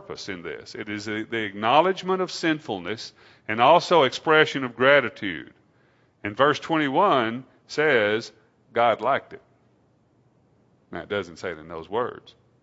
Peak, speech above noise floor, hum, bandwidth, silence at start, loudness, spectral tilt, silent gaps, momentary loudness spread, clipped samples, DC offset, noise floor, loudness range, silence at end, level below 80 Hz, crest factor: -2 dBFS; 39 dB; none; 8 kHz; 0.1 s; -23 LUFS; -4.5 dB/octave; none; 17 LU; under 0.1%; under 0.1%; -62 dBFS; 8 LU; 0.3 s; -66 dBFS; 22 dB